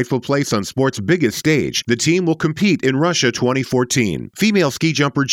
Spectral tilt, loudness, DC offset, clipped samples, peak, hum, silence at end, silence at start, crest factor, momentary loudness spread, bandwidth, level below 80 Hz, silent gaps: -4.5 dB/octave; -17 LUFS; under 0.1%; under 0.1%; -4 dBFS; none; 0 s; 0 s; 14 dB; 3 LU; 17 kHz; -52 dBFS; none